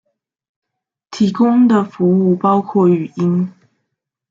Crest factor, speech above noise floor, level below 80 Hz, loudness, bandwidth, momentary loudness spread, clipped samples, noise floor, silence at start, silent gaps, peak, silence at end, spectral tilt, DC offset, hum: 14 dB; 62 dB; -62 dBFS; -14 LUFS; 7.6 kHz; 7 LU; under 0.1%; -75 dBFS; 1.1 s; none; -2 dBFS; 0.8 s; -8.5 dB/octave; under 0.1%; none